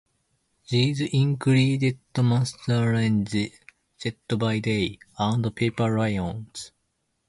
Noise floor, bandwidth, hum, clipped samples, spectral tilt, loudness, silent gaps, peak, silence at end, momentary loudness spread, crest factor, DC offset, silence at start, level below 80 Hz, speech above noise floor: -74 dBFS; 11.5 kHz; none; under 0.1%; -6.5 dB/octave; -25 LUFS; none; -10 dBFS; 0.6 s; 12 LU; 16 dB; under 0.1%; 0.7 s; -52 dBFS; 51 dB